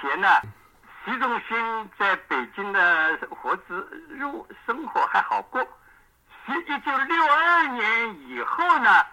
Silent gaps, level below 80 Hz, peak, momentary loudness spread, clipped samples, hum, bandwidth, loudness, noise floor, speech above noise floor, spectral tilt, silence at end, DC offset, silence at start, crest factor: none; -64 dBFS; -4 dBFS; 15 LU; under 0.1%; none; 16.5 kHz; -23 LUFS; -56 dBFS; 33 dB; -4 dB/octave; 0 s; under 0.1%; 0 s; 20 dB